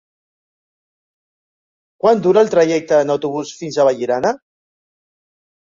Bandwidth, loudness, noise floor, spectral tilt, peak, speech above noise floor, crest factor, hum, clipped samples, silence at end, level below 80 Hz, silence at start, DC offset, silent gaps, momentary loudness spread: 7.6 kHz; -16 LUFS; under -90 dBFS; -5.5 dB/octave; -2 dBFS; over 75 dB; 16 dB; none; under 0.1%; 1.45 s; -62 dBFS; 2.05 s; under 0.1%; none; 11 LU